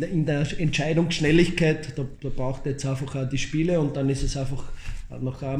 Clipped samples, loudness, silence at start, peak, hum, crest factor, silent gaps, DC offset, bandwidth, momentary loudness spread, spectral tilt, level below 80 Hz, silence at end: under 0.1%; -25 LUFS; 0 s; -8 dBFS; none; 18 dB; none; under 0.1%; 10.5 kHz; 13 LU; -6 dB/octave; -36 dBFS; 0 s